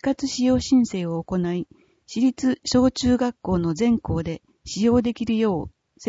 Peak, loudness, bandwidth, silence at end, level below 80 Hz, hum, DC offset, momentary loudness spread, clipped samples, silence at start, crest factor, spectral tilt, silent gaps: -6 dBFS; -22 LUFS; 8 kHz; 0 s; -44 dBFS; none; under 0.1%; 12 LU; under 0.1%; 0 s; 16 dB; -6 dB/octave; none